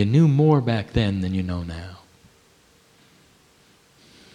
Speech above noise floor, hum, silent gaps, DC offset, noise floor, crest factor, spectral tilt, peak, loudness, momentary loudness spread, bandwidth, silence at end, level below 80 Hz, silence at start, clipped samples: 37 dB; none; none; under 0.1%; -57 dBFS; 18 dB; -8.5 dB/octave; -6 dBFS; -21 LUFS; 18 LU; 9.6 kHz; 2.4 s; -44 dBFS; 0 s; under 0.1%